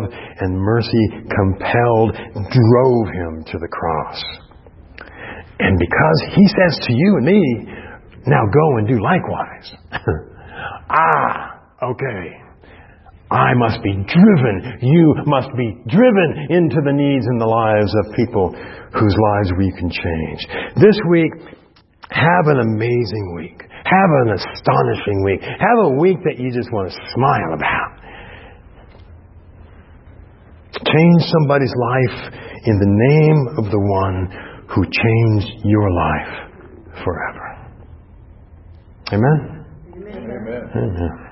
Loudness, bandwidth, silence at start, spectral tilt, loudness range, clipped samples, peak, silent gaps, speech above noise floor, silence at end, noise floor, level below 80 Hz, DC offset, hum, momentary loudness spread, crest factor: -16 LUFS; 5.8 kHz; 0 s; -11 dB/octave; 8 LU; under 0.1%; 0 dBFS; none; 29 dB; 0 s; -45 dBFS; -40 dBFS; under 0.1%; none; 17 LU; 16 dB